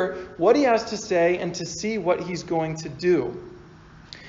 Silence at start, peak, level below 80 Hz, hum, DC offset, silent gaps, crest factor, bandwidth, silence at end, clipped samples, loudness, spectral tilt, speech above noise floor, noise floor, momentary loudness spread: 0 s; -6 dBFS; -56 dBFS; none; under 0.1%; none; 18 dB; 7.6 kHz; 0 s; under 0.1%; -24 LUFS; -4.5 dB/octave; 24 dB; -47 dBFS; 12 LU